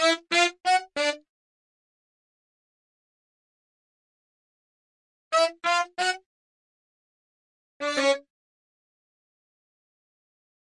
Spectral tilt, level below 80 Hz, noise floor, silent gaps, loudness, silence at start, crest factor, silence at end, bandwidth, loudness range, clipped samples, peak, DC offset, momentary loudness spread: 0 dB/octave; -82 dBFS; under -90 dBFS; 1.29-5.31 s, 6.26-7.80 s; -25 LUFS; 0 s; 24 dB; 2.45 s; 11.5 kHz; 5 LU; under 0.1%; -8 dBFS; under 0.1%; 8 LU